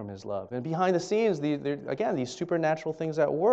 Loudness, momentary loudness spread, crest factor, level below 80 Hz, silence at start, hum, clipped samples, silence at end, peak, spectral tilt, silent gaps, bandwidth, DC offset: -29 LUFS; 8 LU; 16 dB; -68 dBFS; 0 s; none; under 0.1%; 0 s; -12 dBFS; -6.5 dB/octave; none; 8.4 kHz; under 0.1%